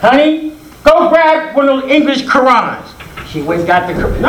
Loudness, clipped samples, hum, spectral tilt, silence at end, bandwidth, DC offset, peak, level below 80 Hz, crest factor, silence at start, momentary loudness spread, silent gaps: -11 LUFS; 0.4%; none; -5.5 dB/octave; 0 s; 18 kHz; under 0.1%; 0 dBFS; -30 dBFS; 10 dB; 0 s; 16 LU; none